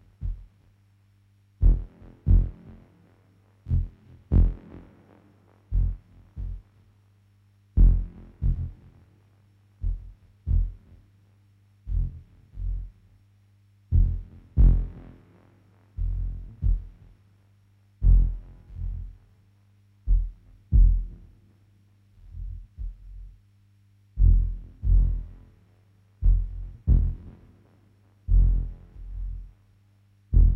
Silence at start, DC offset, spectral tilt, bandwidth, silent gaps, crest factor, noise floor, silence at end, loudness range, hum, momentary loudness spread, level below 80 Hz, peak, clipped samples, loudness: 0.2 s; under 0.1%; -11.5 dB/octave; 1.2 kHz; none; 18 dB; -61 dBFS; 0 s; 7 LU; 50 Hz at -50 dBFS; 23 LU; -26 dBFS; -8 dBFS; under 0.1%; -28 LUFS